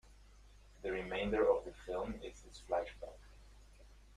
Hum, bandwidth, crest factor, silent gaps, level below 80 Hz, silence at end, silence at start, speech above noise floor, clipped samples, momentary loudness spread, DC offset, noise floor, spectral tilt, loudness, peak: none; 11.5 kHz; 22 dB; none; -56 dBFS; 0 s; 0.1 s; 22 dB; under 0.1%; 20 LU; under 0.1%; -61 dBFS; -5.5 dB/octave; -39 LUFS; -20 dBFS